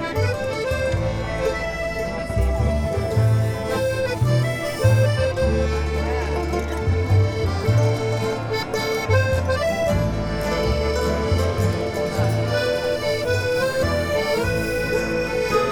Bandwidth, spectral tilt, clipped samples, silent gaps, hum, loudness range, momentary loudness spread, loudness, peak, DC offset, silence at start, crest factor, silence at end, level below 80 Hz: 17 kHz; -6 dB/octave; under 0.1%; none; none; 2 LU; 5 LU; -22 LUFS; -6 dBFS; 0.1%; 0 s; 16 dB; 0 s; -30 dBFS